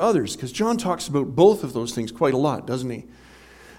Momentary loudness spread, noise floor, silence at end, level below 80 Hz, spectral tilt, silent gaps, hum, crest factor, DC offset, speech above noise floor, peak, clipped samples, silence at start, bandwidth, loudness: 11 LU; -47 dBFS; 0.05 s; -54 dBFS; -5.5 dB/octave; none; none; 20 dB; under 0.1%; 25 dB; -2 dBFS; under 0.1%; 0 s; 16 kHz; -22 LUFS